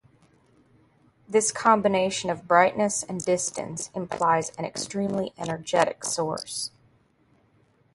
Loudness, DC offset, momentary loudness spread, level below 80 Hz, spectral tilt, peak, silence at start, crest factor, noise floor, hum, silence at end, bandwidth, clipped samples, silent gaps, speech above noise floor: -25 LUFS; under 0.1%; 12 LU; -64 dBFS; -3.5 dB/octave; -4 dBFS; 1.3 s; 24 dB; -63 dBFS; none; 1.25 s; 11.5 kHz; under 0.1%; none; 38 dB